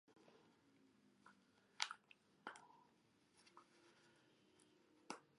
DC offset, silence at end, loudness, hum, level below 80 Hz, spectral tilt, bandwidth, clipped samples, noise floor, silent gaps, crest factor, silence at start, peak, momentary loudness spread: under 0.1%; 0 s; -52 LUFS; none; under -90 dBFS; -0.5 dB/octave; 11 kHz; under 0.1%; -77 dBFS; none; 42 dB; 0.05 s; -18 dBFS; 21 LU